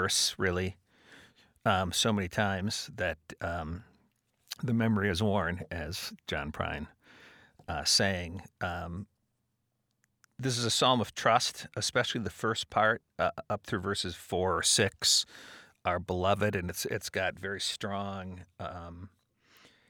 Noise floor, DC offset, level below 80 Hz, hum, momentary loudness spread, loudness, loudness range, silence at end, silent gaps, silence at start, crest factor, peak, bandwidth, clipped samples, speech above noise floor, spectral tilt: -79 dBFS; under 0.1%; -56 dBFS; none; 16 LU; -30 LUFS; 4 LU; 0.85 s; none; 0 s; 22 dB; -10 dBFS; over 20 kHz; under 0.1%; 48 dB; -3 dB/octave